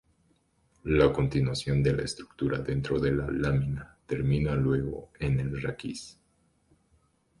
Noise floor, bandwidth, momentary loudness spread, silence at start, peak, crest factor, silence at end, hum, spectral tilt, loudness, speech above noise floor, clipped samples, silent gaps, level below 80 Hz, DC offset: -69 dBFS; 11.5 kHz; 13 LU; 0.85 s; -8 dBFS; 20 dB; 1.3 s; none; -7 dB/octave; -29 LUFS; 41 dB; under 0.1%; none; -44 dBFS; under 0.1%